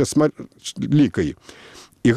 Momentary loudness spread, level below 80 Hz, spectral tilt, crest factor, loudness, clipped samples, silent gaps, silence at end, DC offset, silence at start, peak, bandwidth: 22 LU; -48 dBFS; -6 dB/octave; 18 dB; -20 LUFS; under 0.1%; none; 0 s; under 0.1%; 0 s; -4 dBFS; 13.5 kHz